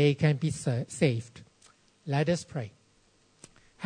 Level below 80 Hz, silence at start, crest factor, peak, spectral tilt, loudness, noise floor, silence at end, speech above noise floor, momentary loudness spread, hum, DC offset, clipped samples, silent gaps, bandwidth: -62 dBFS; 0 s; 20 dB; -10 dBFS; -6.5 dB/octave; -29 LUFS; -65 dBFS; 0 s; 38 dB; 16 LU; none; under 0.1%; under 0.1%; none; 9.6 kHz